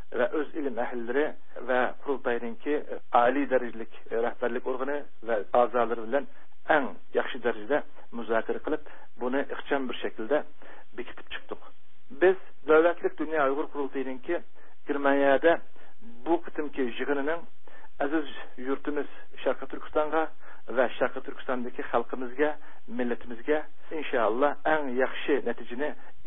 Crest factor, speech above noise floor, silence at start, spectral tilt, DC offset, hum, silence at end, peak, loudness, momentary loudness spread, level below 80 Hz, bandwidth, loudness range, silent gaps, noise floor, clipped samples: 22 dB; 29 dB; 0 s; -9 dB/octave; 3%; none; 0 s; -8 dBFS; -29 LUFS; 15 LU; -64 dBFS; 3.9 kHz; 5 LU; none; -57 dBFS; under 0.1%